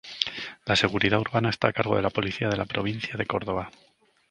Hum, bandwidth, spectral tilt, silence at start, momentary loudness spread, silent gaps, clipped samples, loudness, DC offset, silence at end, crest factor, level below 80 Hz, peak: none; 10.5 kHz; -5.5 dB/octave; 0.05 s; 8 LU; none; under 0.1%; -26 LUFS; under 0.1%; 0.6 s; 24 dB; -52 dBFS; -2 dBFS